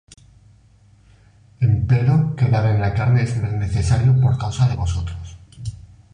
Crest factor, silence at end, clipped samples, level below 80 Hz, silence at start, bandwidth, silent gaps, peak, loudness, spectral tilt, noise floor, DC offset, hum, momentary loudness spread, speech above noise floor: 14 dB; 0.35 s; under 0.1%; -34 dBFS; 1.6 s; 10 kHz; none; -6 dBFS; -19 LUFS; -7.5 dB/octave; -52 dBFS; under 0.1%; none; 17 LU; 34 dB